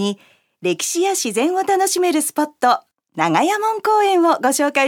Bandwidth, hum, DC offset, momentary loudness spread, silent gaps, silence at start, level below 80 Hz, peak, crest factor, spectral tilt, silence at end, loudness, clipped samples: 18.5 kHz; none; under 0.1%; 8 LU; none; 0 s; -76 dBFS; 0 dBFS; 16 dB; -3 dB/octave; 0 s; -18 LUFS; under 0.1%